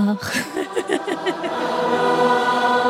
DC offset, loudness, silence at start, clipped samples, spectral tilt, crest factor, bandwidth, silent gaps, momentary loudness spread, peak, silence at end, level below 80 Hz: under 0.1%; -20 LUFS; 0 s; under 0.1%; -4.5 dB/octave; 16 dB; 16 kHz; none; 7 LU; -4 dBFS; 0 s; -62 dBFS